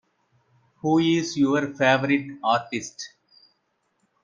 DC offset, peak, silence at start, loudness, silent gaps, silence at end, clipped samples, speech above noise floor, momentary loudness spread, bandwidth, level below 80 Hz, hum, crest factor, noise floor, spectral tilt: under 0.1%; -6 dBFS; 0.85 s; -23 LUFS; none; 1.15 s; under 0.1%; 50 dB; 14 LU; 7.6 kHz; -68 dBFS; none; 20 dB; -72 dBFS; -5 dB/octave